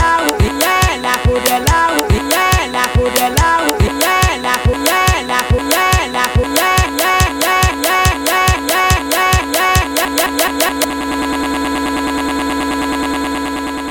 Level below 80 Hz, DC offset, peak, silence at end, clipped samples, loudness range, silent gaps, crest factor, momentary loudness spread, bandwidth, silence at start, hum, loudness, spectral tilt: -24 dBFS; under 0.1%; 0 dBFS; 0 s; under 0.1%; 3 LU; none; 14 dB; 5 LU; 18 kHz; 0 s; none; -13 LUFS; -3.5 dB/octave